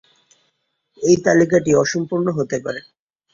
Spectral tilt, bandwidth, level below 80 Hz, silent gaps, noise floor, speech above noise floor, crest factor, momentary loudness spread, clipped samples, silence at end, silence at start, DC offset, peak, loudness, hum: -5.5 dB/octave; 7.6 kHz; -54 dBFS; none; -70 dBFS; 53 dB; 18 dB; 11 LU; under 0.1%; 0.55 s; 1 s; under 0.1%; -2 dBFS; -18 LUFS; none